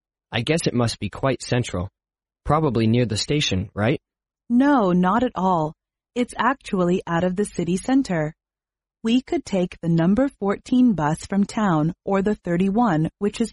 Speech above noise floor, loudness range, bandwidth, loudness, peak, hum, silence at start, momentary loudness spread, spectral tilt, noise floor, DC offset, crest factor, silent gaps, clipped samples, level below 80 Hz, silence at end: over 69 dB; 3 LU; 11.5 kHz; -22 LUFS; -6 dBFS; none; 0.3 s; 8 LU; -6 dB/octave; under -90 dBFS; under 0.1%; 16 dB; none; under 0.1%; -48 dBFS; 0 s